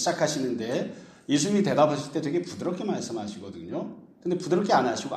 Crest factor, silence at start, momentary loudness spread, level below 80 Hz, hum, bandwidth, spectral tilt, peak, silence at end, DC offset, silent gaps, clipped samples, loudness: 18 dB; 0 s; 14 LU; -68 dBFS; none; 13.5 kHz; -5 dB/octave; -8 dBFS; 0 s; under 0.1%; none; under 0.1%; -27 LUFS